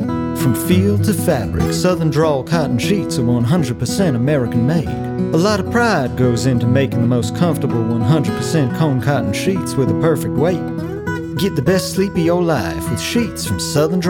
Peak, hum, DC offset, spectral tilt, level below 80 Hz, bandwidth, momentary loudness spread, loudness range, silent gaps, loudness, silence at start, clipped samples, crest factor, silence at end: -2 dBFS; none; under 0.1%; -6 dB/octave; -42 dBFS; 18.5 kHz; 4 LU; 2 LU; none; -17 LUFS; 0 s; under 0.1%; 14 dB; 0 s